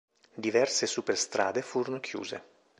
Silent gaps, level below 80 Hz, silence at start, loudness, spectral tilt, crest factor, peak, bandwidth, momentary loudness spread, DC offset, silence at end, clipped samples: none; -76 dBFS; 0.35 s; -30 LUFS; -2.5 dB/octave; 20 dB; -12 dBFS; 11 kHz; 13 LU; under 0.1%; 0.4 s; under 0.1%